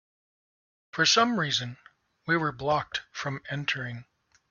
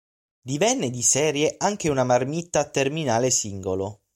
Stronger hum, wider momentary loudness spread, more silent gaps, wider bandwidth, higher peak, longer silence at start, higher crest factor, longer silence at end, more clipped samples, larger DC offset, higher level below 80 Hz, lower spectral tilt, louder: neither; first, 17 LU vs 9 LU; neither; second, 7.4 kHz vs 16.5 kHz; about the same, -10 dBFS vs -8 dBFS; first, 0.95 s vs 0.45 s; about the same, 20 dB vs 16 dB; first, 0.5 s vs 0.2 s; neither; neither; second, -66 dBFS vs -58 dBFS; about the same, -3 dB/octave vs -3.5 dB/octave; second, -27 LUFS vs -23 LUFS